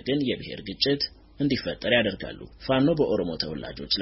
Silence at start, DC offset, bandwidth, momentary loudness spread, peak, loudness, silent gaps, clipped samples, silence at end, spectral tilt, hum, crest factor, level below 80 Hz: 0.05 s; under 0.1%; 6 kHz; 13 LU; -8 dBFS; -26 LUFS; none; under 0.1%; 0 s; -3.5 dB/octave; none; 18 dB; -50 dBFS